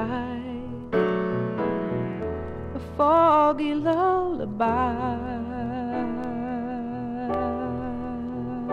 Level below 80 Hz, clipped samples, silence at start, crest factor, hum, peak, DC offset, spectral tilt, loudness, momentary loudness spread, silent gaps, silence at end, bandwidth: -46 dBFS; under 0.1%; 0 s; 18 dB; none; -8 dBFS; under 0.1%; -8.5 dB/octave; -26 LUFS; 11 LU; none; 0 s; 7.6 kHz